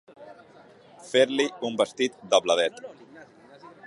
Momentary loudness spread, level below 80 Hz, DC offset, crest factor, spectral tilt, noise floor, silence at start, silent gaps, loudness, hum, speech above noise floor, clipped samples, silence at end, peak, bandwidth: 8 LU; -76 dBFS; under 0.1%; 22 dB; -2.5 dB/octave; -53 dBFS; 0.2 s; none; -25 LUFS; none; 28 dB; under 0.1%; 0 s; -4 dBFS; 11.5 kHz